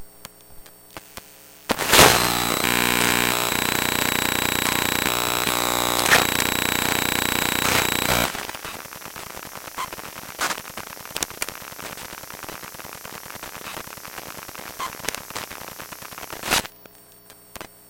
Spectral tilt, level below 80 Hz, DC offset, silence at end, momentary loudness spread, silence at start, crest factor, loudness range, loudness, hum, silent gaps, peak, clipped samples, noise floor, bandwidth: -2 dB/octave; -46 dBFS; under 0.1%; 0.25 s; 19 LU; 0 s; 24 dB; 15 LU; -20 LUFS; none; none; 0 dBFS; under 0.1%; -48 dBFS; 17.5 kHz